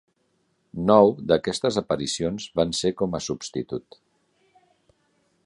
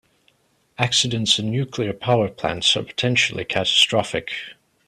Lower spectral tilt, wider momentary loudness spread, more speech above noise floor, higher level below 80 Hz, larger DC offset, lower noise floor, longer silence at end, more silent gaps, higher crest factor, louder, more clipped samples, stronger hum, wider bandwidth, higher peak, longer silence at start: first, -5 dB/octave vs -3.5 dB/octave; first, 14 LU vs 10 LU; first, 47 dB vs 41 dB; about the same, -54 dBFS vs -56 dBFS; neither; first, -70 dBFS vs -62 dBFS; first, 1.65 s vs 0.35 s; neither; about the same, 22 dB vs 20 dB; second, -23 LUFS vs -20 LUFS; neither; neither; second, 11.5 kHz vs 14 kHz; about the same, -2 dBFS vs -2 dBFS; about the same, 0.75 s vs 0.8 s